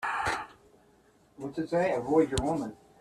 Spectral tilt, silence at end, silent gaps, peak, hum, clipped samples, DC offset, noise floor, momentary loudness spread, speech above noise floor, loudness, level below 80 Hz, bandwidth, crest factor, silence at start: -5.5 dB/octave; 0.25 s; none; -12 dBFS; none; under 0.1%; under 0.1%; -63 dBFS; 15 LU; 34 dB; -30 LUFS; -50 dBFS; 13 kHz; 18 dB; 0 s